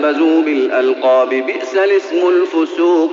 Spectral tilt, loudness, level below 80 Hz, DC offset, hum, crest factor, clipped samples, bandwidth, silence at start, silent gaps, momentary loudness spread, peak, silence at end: -0.5 dB/octave; -14 LUFS; -74 dBFS; under 0.1%; none; 10 dB; under 0.1%; 7.4 kHz; 0 s; none; 4 LU; -2 dBFS; 0 s